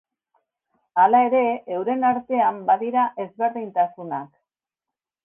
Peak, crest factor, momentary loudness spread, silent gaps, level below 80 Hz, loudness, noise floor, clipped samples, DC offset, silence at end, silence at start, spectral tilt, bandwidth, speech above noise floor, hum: -6 dBFS; 18 dB; 10 LU; none; -72 dBFS; -21 LUFS; -88 dBFS; under 0.1%; under 0.1%; 1 s; 0.95 s; -9 dB/octave; 3.6 kHz; 68 dB; none